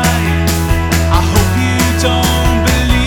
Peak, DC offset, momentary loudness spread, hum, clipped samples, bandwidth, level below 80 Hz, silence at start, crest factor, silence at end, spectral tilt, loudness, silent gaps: 0 dBFS; under 0.1%; 2 LU; none; under 0.1%; 18 kHz; -18 dBFS; 0 s; 12 dB; 0 s; -4.5 dB/octave; -12 LUFS; none